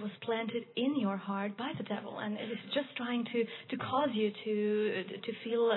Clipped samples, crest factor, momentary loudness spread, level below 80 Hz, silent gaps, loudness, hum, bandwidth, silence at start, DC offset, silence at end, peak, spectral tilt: under 0.1%; 16 dB; 7 LU; -86 dBFS; none; -35 LUFS; none; 4.3 kHz; 0 s; under 0.1%; 0 s; -18 dBFS; -9 dB/octave